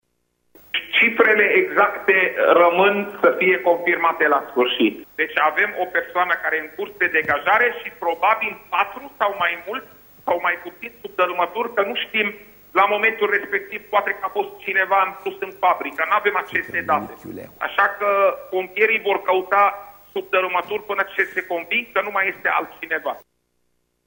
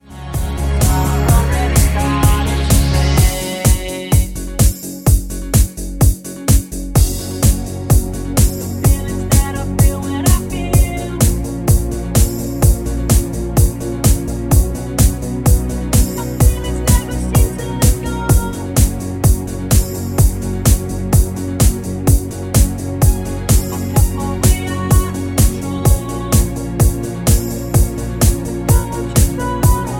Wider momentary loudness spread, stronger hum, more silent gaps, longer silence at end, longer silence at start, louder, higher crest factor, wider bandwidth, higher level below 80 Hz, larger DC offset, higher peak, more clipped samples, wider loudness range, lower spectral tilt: first, 10 LU vs 4 LU; neither; neither; first, 0.9 s vs 0 s; first, 0.75 s vs 0.1 s; second, -19 LUFS vs -16 LUFS; first, 20 dB vs 14 dB; about the same, 16.5 kHz vs 17 kHz; second, -64 dBFS vs -18 dBFS; neither; about the same, -2 dBFS vs 0 dBFS; neither; first, 6 LU vs 1 LU; about the same, -5 dB/octave vs -5.5 dB/octave